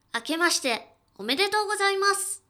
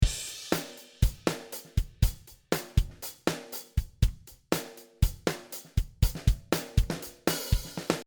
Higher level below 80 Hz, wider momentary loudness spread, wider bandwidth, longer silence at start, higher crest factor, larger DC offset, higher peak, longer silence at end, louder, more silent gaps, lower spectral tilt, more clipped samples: second, -74 dBFS vs -34 dBFS; about the same, 8 LU vs 8 LU; about the same, 20 kHz vs over 20 kHz; first, 0.15 s vs 0 s; about the same, 16 dB vs 20 dB; neither; about the same, -10 dBFS vs -10 dBFS; about the same, 0.1 s vs 0.05 s; first, -24 LUFS vs -32 LUFS; neither; second, -0.5 dB/octave vs -5 dB/octave; neither